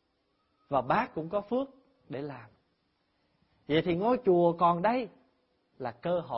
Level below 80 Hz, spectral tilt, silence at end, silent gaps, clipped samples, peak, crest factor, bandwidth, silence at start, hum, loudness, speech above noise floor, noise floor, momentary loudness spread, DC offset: -64 dBFS; -10.5 dB/octave; 0 s; none; under 0.1%; -12 dBFS; 18 dB; 5.8 kHz; 0.7 s; none; -29 LUFS; 46 dB; -75 dBFS; 16 LU; under 0.1%